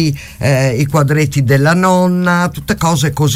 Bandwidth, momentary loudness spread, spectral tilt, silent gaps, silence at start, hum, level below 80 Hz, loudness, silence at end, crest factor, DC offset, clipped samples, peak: 16 kHz; 5 LU; -6 dB/octave; none; 0 s; none; -38 dBFS; -13 LUFS; 0 s; 10 dB; under 0.1%; under 0.1%; -2 dBFS